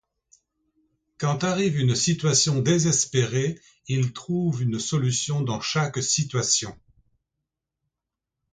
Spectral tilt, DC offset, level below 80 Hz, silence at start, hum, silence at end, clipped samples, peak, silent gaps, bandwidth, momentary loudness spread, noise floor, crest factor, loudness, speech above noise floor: -4 dB/octave; under 0.1%; -58 dBFS; 1.2 s; none; 1.8 s; under 0.1%; -6 dBFS; none; 9.6 kHz; 7 LU; -86 dBFS; 18 dB; -23 LUFS; 63 dB